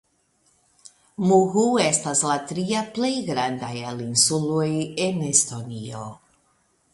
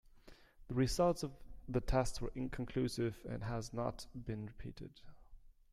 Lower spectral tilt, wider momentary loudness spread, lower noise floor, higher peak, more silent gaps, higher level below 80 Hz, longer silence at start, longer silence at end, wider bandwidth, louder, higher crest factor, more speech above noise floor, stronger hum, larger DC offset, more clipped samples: second, -3.5 dB/octave vs -6 dB/octave; about the same, 15 LU vs 15 LU; first, -65 dBFS vs -61 dBFS; first, -4 dBFS vs -18 dBFS; neither; second, -64 dBFS vs -50 dBFS; first, 1.2 s vs 0.15 s; first, 0.8 s vs 0.2 s; second, 12 kHz vs 14.5 kHz; first, -22 LUFS vs -40 LUFS; about the same, 20 dB vs 20 dB; first, 43 dB vs 22 dB; neither; neither; neither